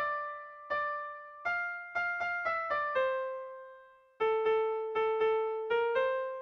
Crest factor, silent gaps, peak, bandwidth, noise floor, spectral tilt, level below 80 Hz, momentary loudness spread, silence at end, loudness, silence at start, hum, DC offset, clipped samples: 14 dB; none; -20 dBFS; 6.2 kHz; -57 dBFS; -3.5 dB/octave; -72 dBFS; 12 LU; 0 s; -33 LUFS; 0 s; none; under 0.1%; under 0.1%